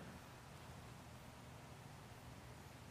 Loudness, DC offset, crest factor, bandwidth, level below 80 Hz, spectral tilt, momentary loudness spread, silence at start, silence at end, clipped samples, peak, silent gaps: -57 LUFS; under 0.1%; 14 dB; 15.5 kHz; -68 dBFS; -5 dB/octave; 1 LU; 0 s; 0 s; under 0.1%; -44 dBFS; none